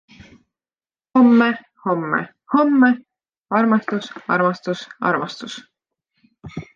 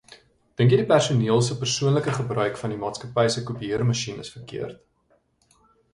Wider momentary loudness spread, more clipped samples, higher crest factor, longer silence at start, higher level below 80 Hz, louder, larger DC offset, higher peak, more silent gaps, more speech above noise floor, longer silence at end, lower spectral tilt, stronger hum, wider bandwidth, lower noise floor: about the same, 16 LU vs 15 LU; neither; about the same, 18 dB vs 18 dB; first, 1.15 s vs 0.1 s; about the same, -60 dBFS vs -56 dBFS; first, -19 LUFS vs -23 LUFS; neither; first, -2 dBFS vs -6 dBFS; first, 3.38-3.43 s vs none; first, over 72 dB vs 43 dB; second, 0.1 s vs 1.2 s; about the same, -6.5 dB/octave vs -5.5 dB/octave; neither; second, 7.2 kHz vs 11.5 kHz; first, under -90 dBFS vs -66 dBFS